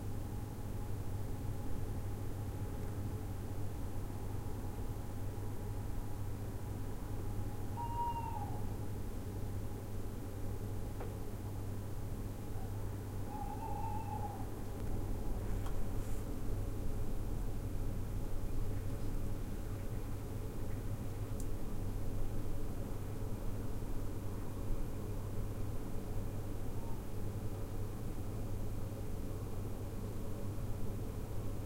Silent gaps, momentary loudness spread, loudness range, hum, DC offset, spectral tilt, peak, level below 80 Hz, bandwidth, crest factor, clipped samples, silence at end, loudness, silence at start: none; 2 LU; 2 LU; none; under 0.1%; -7 dB/octave; -24 dBFS; -42 dBFS; 16 kHz; 14 dB; under 0.1%; 0 s; -43 LUFS; 0 s